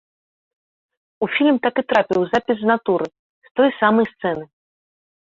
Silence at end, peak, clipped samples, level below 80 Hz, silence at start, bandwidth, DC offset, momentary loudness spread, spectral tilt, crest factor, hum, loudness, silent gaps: 0.75 s; -2 dBFS; under 0.1%; -62 dBFS; 1.2 s; 7.6 kHz; under 0.1%; 10 LU; -6.5 dB/octave; 18 dB; none; -19 LUFS; 3.19-3.42 s, 3.51-3.55 s